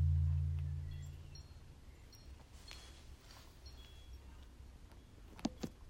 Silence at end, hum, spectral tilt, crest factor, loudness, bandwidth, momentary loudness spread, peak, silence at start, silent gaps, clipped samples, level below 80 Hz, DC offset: 0 s; none; -7 dB/octave; 20 dB; -42 LUFS; 10.5 kHz; 21 LU; -24 dBFS; 0 s; none; under 0.1%; -52 dBFS; under 0.1%